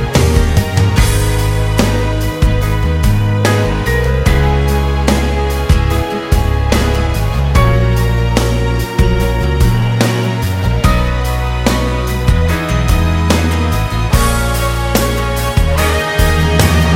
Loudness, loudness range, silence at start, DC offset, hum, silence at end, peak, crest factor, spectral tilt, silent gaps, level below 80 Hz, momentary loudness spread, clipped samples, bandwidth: -13 LUFS; 1 LU; 0 s; under 0.1%; none; 0 s; 0 dBFS; 12 dB; -5.5 dB/octave; none; -16 dBFS; 4 LU; under 0.1%; 16.5 kHz